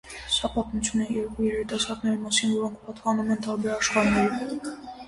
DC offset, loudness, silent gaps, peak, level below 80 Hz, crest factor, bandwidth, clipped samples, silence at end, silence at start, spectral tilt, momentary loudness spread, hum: under 0.1%; -26 LUFS; none; -8 dBFS; -48 dBFS; 18 dB; 11.5 kHz; under 0.1%; 0 s; 0.05 s; -3.5 dB/octave; 9 LU; none